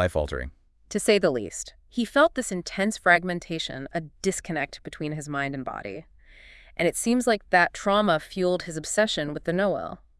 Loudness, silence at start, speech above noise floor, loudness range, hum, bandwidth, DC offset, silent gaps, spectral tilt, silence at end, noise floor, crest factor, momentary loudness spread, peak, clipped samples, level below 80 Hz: -25 LUFS; 0 s; 25 dB; 6 LU; none; 12 kHz; under 0.1%; none; -4 dB/octave; 0.25 s; -50 dBFS; 20 dB; 13 LU; -6 dBFS; under 0.1%; -48 dBFS